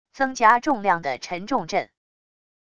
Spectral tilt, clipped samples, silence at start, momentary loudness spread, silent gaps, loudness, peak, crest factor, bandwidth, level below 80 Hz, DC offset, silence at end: -4 dB/octave; under 0.1%; 0.15 s; 11 LU; none; -22 LUFS; -4 dBFS; 20 dB; 10 kHz; -60 dBFS; under 0.1%; 0.75 s